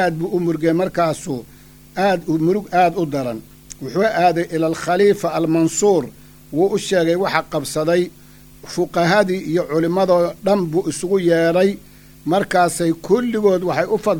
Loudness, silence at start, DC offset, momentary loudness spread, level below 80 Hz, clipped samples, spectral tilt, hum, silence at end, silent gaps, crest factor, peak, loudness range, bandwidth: -18 LUFS; 0 s; under 0.1%; 10 LU; -50 dBFS; under 0.1%; -5.5 dB/octave; none; 0 s; none; 18 dB; 0 dBFS; 2 LU; over 20 kHz